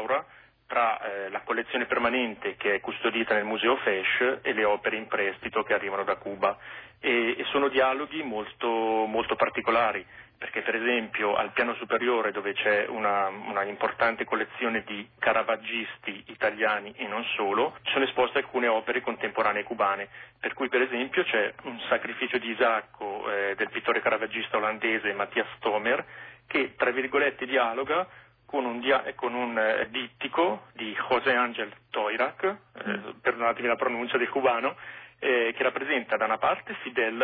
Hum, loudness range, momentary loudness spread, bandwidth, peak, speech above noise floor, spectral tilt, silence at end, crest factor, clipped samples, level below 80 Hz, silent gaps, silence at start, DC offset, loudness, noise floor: none; 2 LU; 8 LU; 4.8 kHz; -10 dBFS; 23 dB; -7.5 dB/octave; 0 s; 16 dB; under 0.1%; -68 dBFS; none; 0 s; under 0.1%; -27 LUFS; -51 dBFS